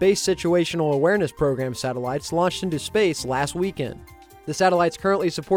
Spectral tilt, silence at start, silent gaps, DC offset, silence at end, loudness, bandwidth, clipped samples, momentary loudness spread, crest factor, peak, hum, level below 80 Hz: -5 dB/octave; 0 s; none; under 0.1%; 0 s; -23 LUFS; 17 kHz; under 0.1%; 8 LU; 16 dB; -6 dBFS; none; -50 dBFS